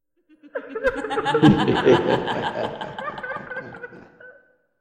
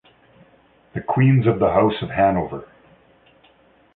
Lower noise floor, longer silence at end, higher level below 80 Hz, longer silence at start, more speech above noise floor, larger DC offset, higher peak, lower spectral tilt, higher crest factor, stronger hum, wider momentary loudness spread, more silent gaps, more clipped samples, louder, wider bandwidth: about the same, -55 dBFS vs -55 dBFS; second, 0.5 s vs 1.3 s; about the same, -50 dBFS vs -48 dBFS; second, 0.45 s vs 0.95 s; about the same, 36 dB vs 38 dB; neither; about the same, -2 dBFS vs -2 dBFS; second, -7 dB/octave vs -12.5 dB/octave; about the same, 20 dB vs 20 dB; neither; first, 19 LU vs 15 LU; neither; neither; about the same, -21 LUFS vs -19 LUFS; first, 9.8 kHz vs 4.1 kHz